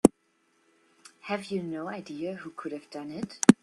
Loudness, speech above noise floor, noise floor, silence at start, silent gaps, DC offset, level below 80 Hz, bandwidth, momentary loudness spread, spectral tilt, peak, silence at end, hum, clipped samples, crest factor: -30 LUFS; 43 dB; -70 dBFS; 0.05 s; none; under 0.1%; -64 dBFS; 12.5 kHz; 16 LU; -5.5 dB/octave; 0 dBFS; 0.1 s; none; under 0.1%; 28 dB